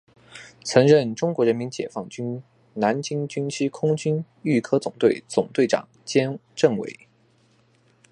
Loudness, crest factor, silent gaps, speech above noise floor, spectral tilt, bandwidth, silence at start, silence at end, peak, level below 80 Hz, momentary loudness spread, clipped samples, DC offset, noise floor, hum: -23 LUFS; 22 dB; none; 38 dB; -6 dB/octave; 11 kHz; 0.35 s; 1.2 s; -2 dBFS; -68 dBFS; 13 LU; under 0.1%; under 0.1%; -61 dBFS; none